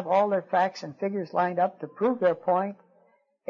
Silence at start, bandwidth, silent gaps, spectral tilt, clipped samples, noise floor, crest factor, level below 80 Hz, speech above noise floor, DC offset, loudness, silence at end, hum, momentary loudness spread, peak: 0 s; 7.2 kHz; none; -7 dB/octave; under 0.1%; -65 dBFS; 16 dB; -80 dBFS; 39 dB; under 0.1%; -27 LUFS; 0.75 s; none; 7 LU; -10 dBFS